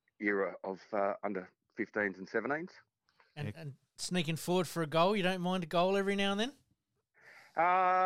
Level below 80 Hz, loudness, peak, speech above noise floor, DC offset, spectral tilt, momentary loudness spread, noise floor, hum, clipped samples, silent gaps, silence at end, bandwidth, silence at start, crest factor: -70 dBFS; -34 LUFS; -16 dBFS; 47 dB; under 0.1%; -5 dB/octave; 14 LU; -80 dBFS; none; under 0.1%; none; 0 s; 16.5 kHz; 0.2 s; 18 dB